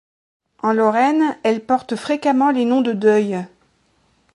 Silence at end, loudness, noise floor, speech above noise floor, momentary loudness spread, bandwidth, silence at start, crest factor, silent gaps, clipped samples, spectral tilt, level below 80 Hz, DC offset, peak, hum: 0.9 s; -18 LUFS; -61 dBFS; 44 dB; 8 LU; 11.5 kHz; 0.65 s; 16 dB; none; under 0.1%; -6 dB/octave; -66 dBFS; under 0.1%; -4 dBFS; none